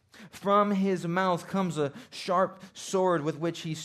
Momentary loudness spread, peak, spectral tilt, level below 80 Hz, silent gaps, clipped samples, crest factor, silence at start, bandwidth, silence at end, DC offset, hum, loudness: 10 LU; -12 dBFS; -5.5 dB/octave; -74 dBFS; none; under 0.1%; 18 dB; 0.15 s; 13.5 kHz; 0 s; under 0.1%; none; -28 LUFS